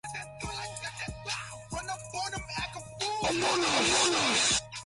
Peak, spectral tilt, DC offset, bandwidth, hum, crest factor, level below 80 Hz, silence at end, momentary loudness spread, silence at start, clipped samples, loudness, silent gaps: -14 dBFS; -1.5 dB/octave; under 0.1%; 11.5 kHz; none; 18 dB; -52 dBFS; 0 s; 14 LU; 0.05 s; under 0.1%; -29 LUFS; none